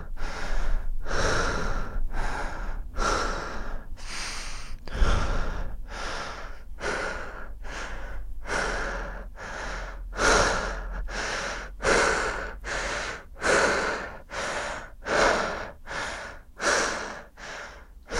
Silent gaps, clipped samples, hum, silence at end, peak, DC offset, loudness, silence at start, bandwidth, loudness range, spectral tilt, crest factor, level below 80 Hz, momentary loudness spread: none; under 0.1%; none; 0 s; -8 dBFS; under 0.1%; -29 LUFS; 0 s; 12 kHz; 7 LU; -3 dB/octave; 20 dB; -32 dBFS; 17 LU